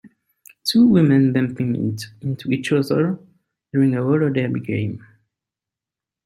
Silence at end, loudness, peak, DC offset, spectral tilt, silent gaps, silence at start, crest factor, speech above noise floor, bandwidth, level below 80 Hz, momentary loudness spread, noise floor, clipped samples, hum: 1.3 s; -19 LUFS; -4 dBFS; under 0.1%; -7 dB/octave; none; 0.05 s; 16 dB; 70 dB; 15 kHz; -60 dBFS; 13 LU; -88 dBFS; under 0.1%; none